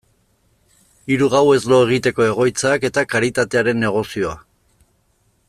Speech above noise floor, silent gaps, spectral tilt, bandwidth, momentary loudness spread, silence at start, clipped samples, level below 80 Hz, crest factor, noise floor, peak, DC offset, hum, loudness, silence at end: 45 dB; none; -5 dB/octave; 14 kHz; 10 LU; 1.05 s; under 0.1%; -52 dBFS; 16 dB; -62 dBFS; -2 dBFS; under 0.1%; none; -17 LUFS; 1.1 s